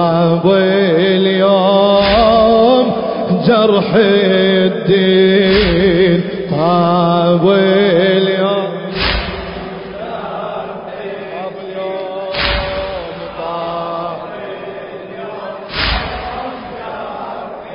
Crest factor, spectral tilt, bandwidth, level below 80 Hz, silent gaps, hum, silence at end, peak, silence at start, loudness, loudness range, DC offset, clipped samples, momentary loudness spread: 14 dB; -10.5 dB/octave; 5.4 kHz; -32 dBFS; none; none; 0 s; 0 dBFS; 0 s; -13 LUFS; 11 LU; under 0.1%; under 0.1%; 16 LU